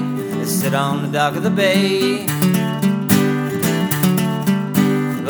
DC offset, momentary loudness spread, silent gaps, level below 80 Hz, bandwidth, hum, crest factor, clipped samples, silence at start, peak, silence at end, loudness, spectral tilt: under 0.1%; 4 LU; none; -60 dBFS; over 20 kHz; none; 16 dB; under 0.1%; 0 s; 0 dBFS; 0 s; -17 LUFS; -5.5 dB/octave